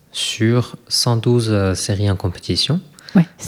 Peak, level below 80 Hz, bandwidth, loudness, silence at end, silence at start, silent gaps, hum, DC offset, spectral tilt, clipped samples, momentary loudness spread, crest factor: -2 dBFS; -48 dBFS; 15.5 kHz; -18 LUFS; 0 s; 0.15 s; none; none; under 0.1%; -5 dB/octave; under 0.1%; 5 LU; 16 dB